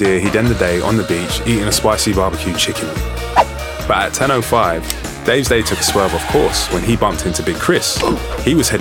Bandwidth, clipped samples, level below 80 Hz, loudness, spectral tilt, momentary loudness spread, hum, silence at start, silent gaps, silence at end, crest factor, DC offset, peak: 18.5 kHz; under 0.1%; -28 dBFS; -15 LUFS; -4 dB/octave; 5 LU; none; 0 s; none; 0 s; 16 dB; under 0.1%; 0 dBFS